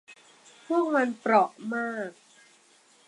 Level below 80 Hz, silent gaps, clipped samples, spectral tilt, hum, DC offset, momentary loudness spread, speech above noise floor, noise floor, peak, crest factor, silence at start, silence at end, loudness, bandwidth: -86 dBFS; none; under 0.1%; -5.5 dB/octave; none; under 0.1%; 11 LU; 34 dB; -60 dBFS; -8 dBFS; 20 dB; 0.1 s; 0.95 s; -27 LUFS; 11.5 kHz